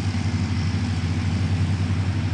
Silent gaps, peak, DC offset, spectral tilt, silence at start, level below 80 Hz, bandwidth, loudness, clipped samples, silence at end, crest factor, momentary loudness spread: none; -12 dBFS; under 0.1%; -6.5 dB/octave; 0 s; -46 dBFS; 9.8 kHz; -24 LUFS; under 0.1%; 0 s; 10 dB; 1 LU